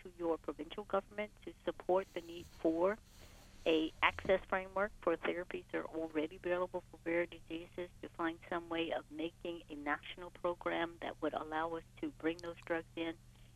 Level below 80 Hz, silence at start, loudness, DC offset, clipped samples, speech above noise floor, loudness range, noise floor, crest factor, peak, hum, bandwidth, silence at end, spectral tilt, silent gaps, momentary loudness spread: -62 dBFS; 0 s; -40 LUFS; under 0.1%; under 0.1%; 19 dB; 5 LU; -58 dBFS; 24 dB; -16 dBFS; none; 13.5 kHz; 0.05 s; -5.5 dB/octave; none; 12 LU